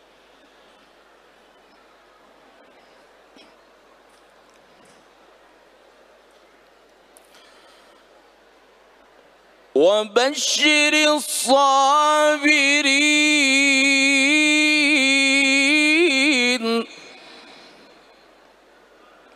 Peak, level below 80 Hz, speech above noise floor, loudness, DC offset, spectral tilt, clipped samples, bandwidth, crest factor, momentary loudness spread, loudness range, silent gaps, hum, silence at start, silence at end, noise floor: -4 dBFS; -74 dBFS; 36 dB; -16 LUFS; under 0.1%; 0 dB/octave; under 0.1%; 15.5 kHz; 18 dB; 4 LU; 9 LU; none; none; 9.75 s; 2.35 s; -53 dBFS